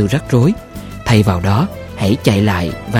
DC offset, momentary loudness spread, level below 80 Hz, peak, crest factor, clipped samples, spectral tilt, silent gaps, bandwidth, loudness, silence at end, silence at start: under 0.1%; 10 LU; -36 dBFS; 0 dBFS; 14 dB; under 0.1%; -6.5 dB/octave; none; 16 kHz; -15 LUFS; 0 s; 0 s